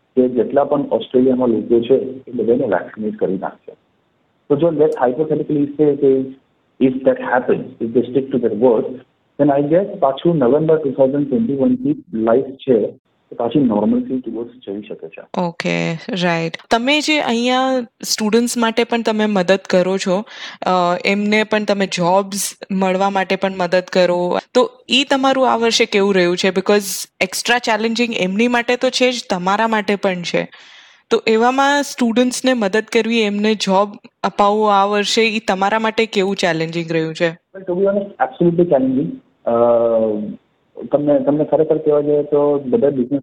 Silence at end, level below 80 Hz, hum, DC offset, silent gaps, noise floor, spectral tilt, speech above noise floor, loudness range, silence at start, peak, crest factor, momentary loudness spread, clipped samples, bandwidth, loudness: 0 s; -58 dBFS; none; under 0.1%; 12.99-13.05 s; -62 dBFS; -4.5 dB/octave; 46 dB; 3 LU; 0.15 s; -2 dBFS; 16 dB; 7 LU; under 0.1%; 18 kHz; -16 LUFS